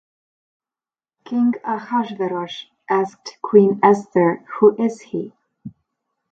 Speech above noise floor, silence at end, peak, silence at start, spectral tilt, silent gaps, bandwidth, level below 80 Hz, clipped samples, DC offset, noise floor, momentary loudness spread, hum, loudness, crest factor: over 72 dB; 0.6 s; 0 dBFS; 1.3 s; -7 dB/octave; none; 7.8 kHz; -68 dBFS; under 0.1%; under 0.1%; under -90 dBFS; 14 LU; none; -19 LUFS; 20 dB